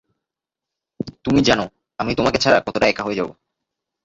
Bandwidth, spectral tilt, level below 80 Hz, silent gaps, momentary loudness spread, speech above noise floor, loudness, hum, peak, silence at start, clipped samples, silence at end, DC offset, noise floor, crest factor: 8 kHz; -4.5 dB/octave; -46 dBFS; none; 14 LU; 68 dB; -19 LUFS; none; -2 dBFS; 1 s; under 0.1%; 0.75 s; under 0.1%; -86 dBFS; 20 dB